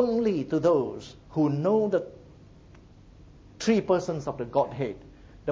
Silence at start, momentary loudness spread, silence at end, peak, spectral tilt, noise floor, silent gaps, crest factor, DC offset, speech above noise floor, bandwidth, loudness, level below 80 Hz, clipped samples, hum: 0 s; 11 LU; 0 s; -10 dBFS; -7 dB/octave; -51 dBFS; none; 16 dB; under 0.1%; 25 dB; 7.8 kHz; -27 LUFS; -56 dBFS; under 0.1%; none